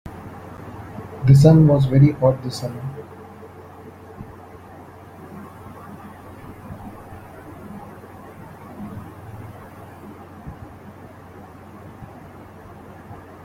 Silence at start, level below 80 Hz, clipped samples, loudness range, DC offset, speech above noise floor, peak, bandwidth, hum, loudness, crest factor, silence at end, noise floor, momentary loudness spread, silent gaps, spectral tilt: 0.05 s; -48 dBFS; under 0.1%; 23 LU; under 0.1%; 27 dB; -2 dBFS; 12.5 kHz; none; -16 LUFS; 22 dB; 0.3 s; -41 dBFS; 27 LU; none; -8.5 dB/octave